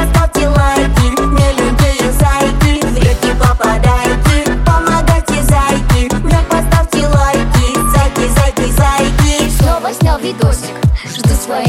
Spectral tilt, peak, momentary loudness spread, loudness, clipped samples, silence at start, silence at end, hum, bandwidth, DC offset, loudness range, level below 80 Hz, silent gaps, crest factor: -5.5 dB/octave; 0 dBFS; 2 LU; -12 LUFS; under 0.1%; 0 s; 0 s; none; 16.5 kHz; under 0.1%; 1 LU; -14 dBFS; none; 10 dB